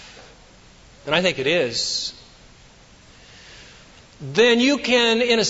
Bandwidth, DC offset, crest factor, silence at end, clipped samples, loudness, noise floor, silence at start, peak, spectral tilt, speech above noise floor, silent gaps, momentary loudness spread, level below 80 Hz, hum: 8 kHz; under 0.1%; 18 dB; 0 s; under 0.1%; -19 LUFS; -49 dBFS; 0 s; -4 dBFS; -3 dB/octave; 30 dB; none; 12 LU; -54 dBFS; none